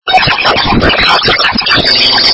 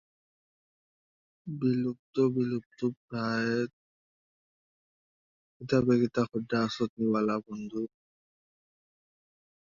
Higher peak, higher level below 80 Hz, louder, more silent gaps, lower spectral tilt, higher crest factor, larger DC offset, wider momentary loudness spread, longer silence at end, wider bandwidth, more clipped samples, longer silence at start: first, 0 dBFS vs -12 dBFS; first, -26 dBFS vs -68 dBFS; first, -7 LUFS vs -30 LUFS; second, none vs 1.99-2.13 s, 2.66-2.70 s, 2.97-3.08 s, 3.73-5.60 s, 6.89-6.97 s; second, -4 dB/octave vs -7 dB/octave; second, 8 dB vs 20 dB; neither; second, 3 LU vs 12 LU; second, 0 s vs 1.75 s; about the same, 8 kHz vs 7.4 kHz; first, 1% vs under 0.1%; second, 0.05 s vs 1.45 s